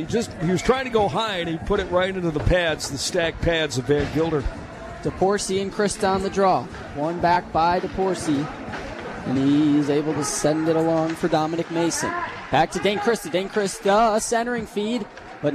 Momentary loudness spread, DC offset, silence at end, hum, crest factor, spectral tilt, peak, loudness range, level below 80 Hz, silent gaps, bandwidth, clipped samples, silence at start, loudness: 8 LU; under 0.1%; 0 s; none; 16 dB; -4.5 dB/octave; -6 dBFS; 1 LU; -40 dBFS; none; 14 kHz; under 0.1%; 0 s; -22 LUFS